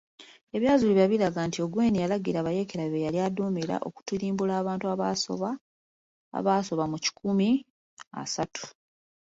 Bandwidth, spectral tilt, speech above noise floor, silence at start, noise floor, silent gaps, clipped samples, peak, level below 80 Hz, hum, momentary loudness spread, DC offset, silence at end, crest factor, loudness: 8 kHz; -5.5 dB/octave; over 63 dB; 0.2 s; under -90 dBFS; 0.43-0.47 s, 5.61-6.32 s, 7.70-7.97 s, 8.07-8.11 s; under 0.1%; -10 dBFS; -62 dBFS; none; 11 LU; under 0.1%; 0.65 s; 18 dB; -28 LUFS